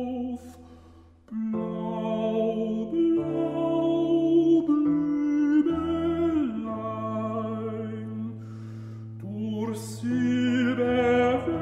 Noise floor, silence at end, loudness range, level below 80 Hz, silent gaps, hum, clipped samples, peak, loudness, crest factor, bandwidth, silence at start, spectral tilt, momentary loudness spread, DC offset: -52 dBFS; 0 s; 8 LU; -56 dBFS; none; none; under 0.1%; -12 dBFS; -26 LUFS; 14 dB; 12 kHz; 0 s; -7.5 dB/octave; 14 LU; under 0.1%